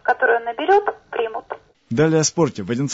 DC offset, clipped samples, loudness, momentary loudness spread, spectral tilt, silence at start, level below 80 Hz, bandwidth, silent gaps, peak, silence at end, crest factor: under 0.1%; under 0.1%; -19 LUFS; 12 LU; -4.5 dB/octave; 0.05 s; -58 dBFS; 8 kHz; none; -6 dBFS; 0 s; 14 dB